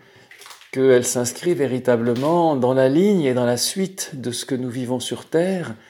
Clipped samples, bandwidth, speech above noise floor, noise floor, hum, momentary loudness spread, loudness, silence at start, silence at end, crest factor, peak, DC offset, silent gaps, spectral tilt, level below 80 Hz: under 0.1%; 18 kHz; 26 dB; -46 dBFS; none; 9 LU; -20 LUFS; 0.4 s; 0.15 s; 16 dB; -4 dBFS; under 0.1%; none; -5 dB/octave; -68 dBFS